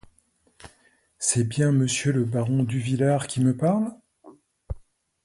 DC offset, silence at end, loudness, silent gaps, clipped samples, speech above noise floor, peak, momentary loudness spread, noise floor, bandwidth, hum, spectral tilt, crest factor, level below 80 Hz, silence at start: under 0.1%; 0.45 s; -24 LUFS; none; under 0.1%; 42 dB; -8 dBFS; 16 LU; -65 dBFS; 11.5 kHz; none; -5.5 dB/octave; 18 dB; -50 dBFS; 0.65 s